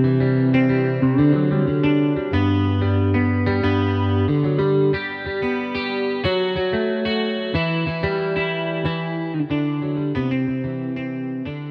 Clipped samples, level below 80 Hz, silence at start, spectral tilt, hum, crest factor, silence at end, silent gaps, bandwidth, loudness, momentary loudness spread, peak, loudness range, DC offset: under 0.1%; -46 dBFS; 0 s; -9 dB/octave; none; 14 dB; 0 s; none; 6 kHz; -21 LUFS; 8 LU; -6 dBFS; 4 LU; under 0.1%